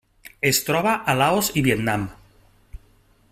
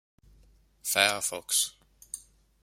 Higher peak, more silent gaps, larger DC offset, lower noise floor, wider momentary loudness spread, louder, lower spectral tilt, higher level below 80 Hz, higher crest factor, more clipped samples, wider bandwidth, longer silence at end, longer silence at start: about the same, -4 dBFS vs -4 dBFS; neither; neither; second, -57 dBFS vs -61 dBFS; second, 6 LU vs 18 LU; first, -21 LUFS vs -27 LUFS; first, -4 dB/octave vs 0.5 dB/octave; first, -48 dBFS vs -64 dBFS; second, 20 dB vs 28 dB; neither; about the same, 16 kHz vs 16.5 kHz; about the same, 0.55 s vs 0.45 s; second, 0.25 s vs 0.85 s